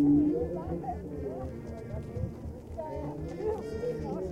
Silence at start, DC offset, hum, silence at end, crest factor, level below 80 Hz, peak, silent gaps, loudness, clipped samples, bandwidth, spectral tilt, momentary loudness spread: 0 s; under 0.1%; none; 0 s; 16 dB; -46 dBFS; -16 dBFS; none; -34 LUFS; under 0.1%; 8.2 kHz; -9.5 dB/octave; 11 LU